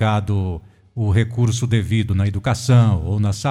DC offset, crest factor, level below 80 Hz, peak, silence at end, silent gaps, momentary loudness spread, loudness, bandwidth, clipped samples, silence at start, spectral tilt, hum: under 0.1%; 14 dB; -38 dBFS; -4 dBFS; 0 s; none; 10 LU; -19 LUFS; 12 kHz; under 0.1%; 0 s; -6.5 dB/octave; none